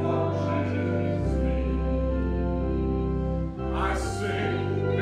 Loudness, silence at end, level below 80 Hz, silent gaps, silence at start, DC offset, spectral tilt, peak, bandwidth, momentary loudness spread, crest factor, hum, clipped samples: -27 LUFS; 0 s; -32 dBFS; none; 0 s; under 0.1%; -7.5 dB/octave; -14 dBFS; 10.5 kHz; 2 LU; 12 dB; none; under 0.1%